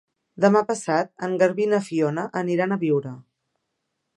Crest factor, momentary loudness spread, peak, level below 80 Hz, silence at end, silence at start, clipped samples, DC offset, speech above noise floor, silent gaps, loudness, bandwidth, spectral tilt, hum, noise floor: 20 dB; 7 LU; -4 dBFS; -74 dBFS; 0.95 s; 0.35 s; under 0.1%; under 0.1%; 56 dB; none; -22 LUFS; 11.5 kHz; -6.5 dB/octave; none; -78 dBFS